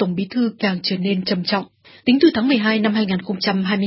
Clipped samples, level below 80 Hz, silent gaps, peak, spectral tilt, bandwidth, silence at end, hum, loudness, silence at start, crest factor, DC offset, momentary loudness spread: under 0.1%; -58 dBFS; none; -2 dBFS; -9.5 dB/octave; 5.8 kHz; 0 s; none; -19 LUFS; 0 s; 16 dB; under 0.1%; 7 LU